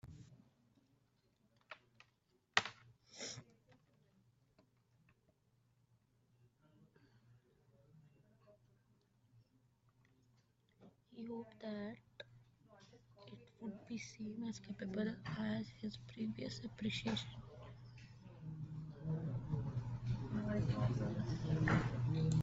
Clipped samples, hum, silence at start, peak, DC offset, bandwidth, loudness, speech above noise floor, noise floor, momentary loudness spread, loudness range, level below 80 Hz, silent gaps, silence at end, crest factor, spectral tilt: under 0.1%; none; 0.05 s; -12 dBFS; under 0.1%; 7.6 kHz; -43 LUFS; 37 dB; -79 dBFS; 21 LU; 13 LU; -64 dBFS; none; 0 s; 34 dB; -5.5 dB/octave